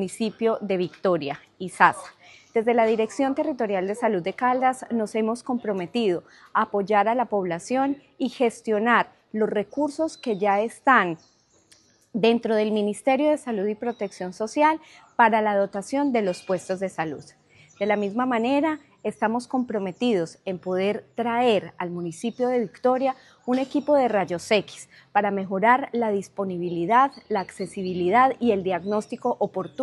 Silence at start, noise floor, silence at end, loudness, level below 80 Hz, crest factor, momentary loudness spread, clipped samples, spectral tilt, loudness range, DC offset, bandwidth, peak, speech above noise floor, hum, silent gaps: 0 s; -59 dBFS; 0 s; -24 LUFS; -72 dBFS; 22 dB; 11 LU; under 0.1%; -5.5 dB/octave; 2 LU; under 0.1%; 12 kHz; -2 dBFS; 35 dB; none; none